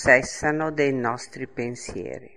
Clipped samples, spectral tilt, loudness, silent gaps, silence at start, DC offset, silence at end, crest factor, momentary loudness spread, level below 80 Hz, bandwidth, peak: under 0.1%; -4.5 dB/octave; -25 LUFS; none; 0 s; 0.3%; 0.1 s; 22 dB; 15 LU; -50 dBFS; 11.5 kHz; -2 dBFS